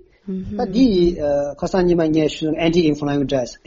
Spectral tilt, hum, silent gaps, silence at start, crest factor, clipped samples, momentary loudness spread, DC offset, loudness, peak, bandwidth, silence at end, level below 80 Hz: -6 dB/octave; none; none; 0.25 s; 14 dB; under 0.1%; 8 LU; under 0.1%; -18 LUFS; -4 dBFS; 7.6 kHz; 0.15 s; -38 dBFS